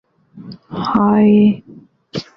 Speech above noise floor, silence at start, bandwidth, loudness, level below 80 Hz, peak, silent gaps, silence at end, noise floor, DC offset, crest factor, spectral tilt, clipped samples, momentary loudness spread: 30 dB; 0.35 s; 6.2 kHz; -13 LUFS; -52 dBFS; -2 dBFS; none; 0.15 s; -42 dBFS; under 0.1%; 14 dB; -8.5 dB/octave; under 0.1%; 18 LU